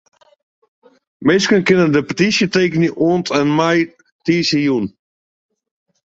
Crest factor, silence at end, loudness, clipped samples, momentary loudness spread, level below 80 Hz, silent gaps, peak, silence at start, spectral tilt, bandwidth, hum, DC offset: 16 dB; 1.15 s; -15 LUFS; under 0.1%; 7 LU; -56 dBFS; 4.12-4.19 s; -2 dBFS; 1.2 s; -5 dB/octave; 8 kHz; none; under 0.1%